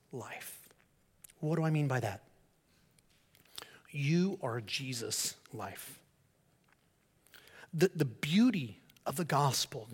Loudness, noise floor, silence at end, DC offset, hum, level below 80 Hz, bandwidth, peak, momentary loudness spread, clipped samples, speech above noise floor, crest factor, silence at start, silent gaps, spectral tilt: -34 LUFS; -72 dBFS; 0 s; under 0.1%; none; -76 dBFS; 17 kHz; -16 dBFS; 19 LU; under 0.1%; 38 dB; 20 dB; 0.15 s; none; -5 dB/octave